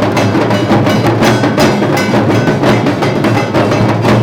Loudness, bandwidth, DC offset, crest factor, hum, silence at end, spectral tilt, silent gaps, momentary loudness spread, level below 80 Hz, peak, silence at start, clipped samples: -10 LUFS; 18.5 kHz; under 0.1%; 8 dB; none; 0 s; -6 dB/octave; none; 2 LU; -36 dBFS; -2 dBFS; 0 s; under 0.1%